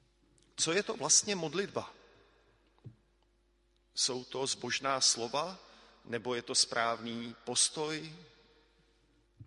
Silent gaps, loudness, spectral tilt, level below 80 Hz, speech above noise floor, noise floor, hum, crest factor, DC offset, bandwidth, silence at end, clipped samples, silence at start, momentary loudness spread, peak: none; -32 LUFS; -1 dB/octave; -72 dBFS; 38 dB; -72 dBFS; none; 22 dB; under 0.1%; 11.5 kHz; 0 s; under 0.1%; 0.55 s; 16 LU; -14 dBFS